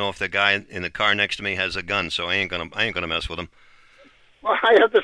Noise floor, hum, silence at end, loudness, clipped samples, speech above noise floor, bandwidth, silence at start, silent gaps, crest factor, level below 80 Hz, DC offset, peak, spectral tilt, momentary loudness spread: -53 dBFS; none; 0 s; -21 LUFS; under 0.1%; 31 dB; 11 kHz; 0 s; none; 20 dB; -48 dBFS; under 0.1%; -2 dBFS; -4 dB/octave; 13 LU